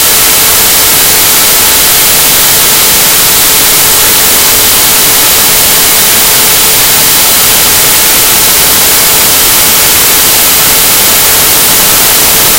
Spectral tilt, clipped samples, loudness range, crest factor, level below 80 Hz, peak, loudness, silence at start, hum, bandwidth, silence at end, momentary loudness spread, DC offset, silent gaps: 0 dB/octave; 10%; 0 LU; 4 dB; -28 dBFS; 0 dBFS; -1 LUFS; 0 s; none; over 20 kHz; 0 s; 0 LU; 2%; none